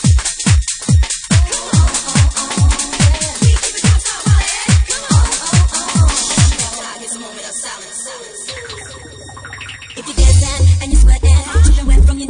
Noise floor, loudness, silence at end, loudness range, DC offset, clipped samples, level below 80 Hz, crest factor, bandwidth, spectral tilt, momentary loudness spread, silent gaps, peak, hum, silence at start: -32 dBFS; -13 LUFS; 0 s; 7 LU; under 0.1%; under 0.1%; -16 dBFS; 12 dB; 10.5 kHz; -4 dB/octave; 15 LU; none; 0 dBFS; none; 0 s